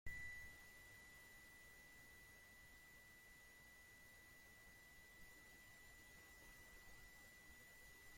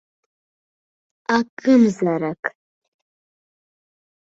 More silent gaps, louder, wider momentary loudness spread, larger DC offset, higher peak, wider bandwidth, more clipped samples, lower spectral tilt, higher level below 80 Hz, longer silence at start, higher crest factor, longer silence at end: second, none vs 1.49-1.57 s, 2.39-2.43 s; second, -62 LUFS vs -19 LUFS; second, 4 LU vs 14 LU; neither; second, -38 dBFS vs -2 dBFS; first, 16.5 kHz vs 7.8 kHz; neither; second, -2.5 dB/octave vs -6.5 dB/octave; second, -72 dBFS vs -66 dBFS; second, 0.05 s vs 1.3 s; about the same, 22 dB vs 20 dB; second, 0 s vs 1.75 s